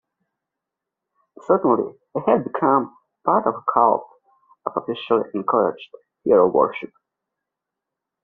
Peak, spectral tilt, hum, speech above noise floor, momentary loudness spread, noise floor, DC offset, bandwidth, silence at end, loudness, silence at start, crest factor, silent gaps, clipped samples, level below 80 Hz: -2 dBFS; -5.5 dB/octave; none; 65 dB; 14 LU; -84 dBFS; under 0.1%; 4.3 kHz; 1.35 s; -20 LUFS; 1.5 s; 20 dB; none; under 0.1%; -66 dBFS